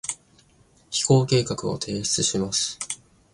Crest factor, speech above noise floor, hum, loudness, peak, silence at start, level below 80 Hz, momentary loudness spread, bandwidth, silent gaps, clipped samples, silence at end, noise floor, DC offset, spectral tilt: 20 dB; 35 dB; none; -23 LUFS; -6 dBFS; 0.05 s; -54 dBFS; 13 LU; 11.5 kHz; none; under 0.1%; 0.4 s; -58 dBFS; under 0.1%; -4 dB/octave